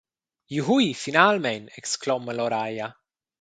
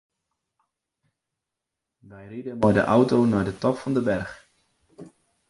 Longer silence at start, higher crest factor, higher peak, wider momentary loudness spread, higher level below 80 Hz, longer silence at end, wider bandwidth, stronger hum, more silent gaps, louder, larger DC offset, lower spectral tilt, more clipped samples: second, 0.5 s vs 2.1 s; about the same, 24 dB vs 20 dB; first, 0 dBFS vs -6 dBFS; second, 13 LU vs 18 LU; second, -70 dBFS vs -54 dBFS; about the same, 0.5 s vs 0.4 s; second, 9.4 kHz vs 11.5 kHz; neither; neither; about the same, -24 LUFS vs -22 LUFS; neither; second, -4 dB/octave vs -7.5 dB/octave; neither